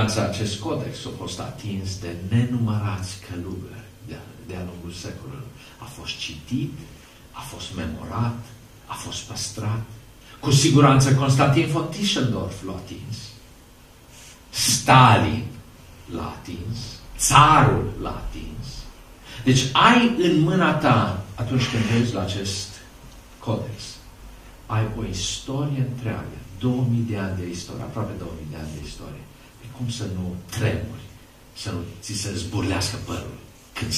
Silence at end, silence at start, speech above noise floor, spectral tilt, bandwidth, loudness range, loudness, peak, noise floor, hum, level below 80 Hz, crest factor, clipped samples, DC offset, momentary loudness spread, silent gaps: 0 s; 0 s; 26 dB; -5 dB/octave; 15 kHz; 12 LU; -22 LUFS; 0 dBFS; -48 dBFS; none; -44 dBFS; 24 dB; under 0.1%; under 0.1%; 22 LU; none